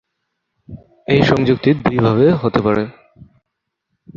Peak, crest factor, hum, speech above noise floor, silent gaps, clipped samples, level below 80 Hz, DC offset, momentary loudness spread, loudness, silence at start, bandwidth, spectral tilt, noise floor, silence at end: 0 dBFS; 16 dB; none; 63 dB; none; under 0.1%; -44 dBFS; under 0.1%; 7 LU; -15 LUFS; 0.7 s; 7.4 kHz; -8 dB/octave; -77 dBFS; 1.25 s